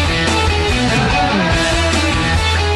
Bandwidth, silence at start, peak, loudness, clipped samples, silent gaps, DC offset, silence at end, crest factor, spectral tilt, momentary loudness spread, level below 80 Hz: 12.5 kHz; 0 s; -2 dBFS; -14 LUFS; under 0.1%; none; under 0.1%; 0 s; 12 dB; -4.5 dB/octave; 1 LU; -22 dBFS